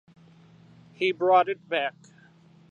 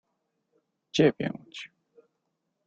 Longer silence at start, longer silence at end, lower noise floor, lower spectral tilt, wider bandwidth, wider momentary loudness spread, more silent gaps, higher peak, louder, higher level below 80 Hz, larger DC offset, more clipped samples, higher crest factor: about the same, 1 s vs 0.95 s; second, 0.8 s vs 1 s; second, -55 dBFS vs -80 dBFS; about the same, -5.5 dB/octave vs -6 dB/octave; about the same, 7.6 kHz vs 8.2 kHz; second, 8 LU vs 19 LU; neither; about the same, -8 dBFS vs -10 dBFS; about the same, -25 LUFS vs -26 LUFS; second, -78 dBFS vs -68 dBFS; neither; neither; about the same, 20 dB vs 22 dB